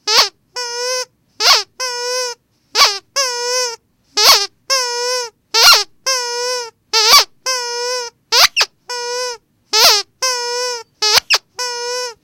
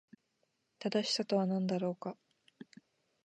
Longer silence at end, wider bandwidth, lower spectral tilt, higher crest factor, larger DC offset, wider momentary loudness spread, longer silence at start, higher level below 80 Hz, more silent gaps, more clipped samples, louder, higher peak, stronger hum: second, 0.1 s vs 0.65 s; first, over 20 kHz vs 9.8 kHz; second, 3 dB/octave vs -5.5 dB/octave; about the same, 16 dB vs 18 dB; neither; second, 14 LU vs 24 LU; second, 0.05 s vs 0.8 s; first, -56 dBFS vs -88 dBFS; neither; first, 0.3% vs under 0.1%; first, -13 LUFS vs -35 LUFS; first, 0 dBFS vs -20 dBFS; neither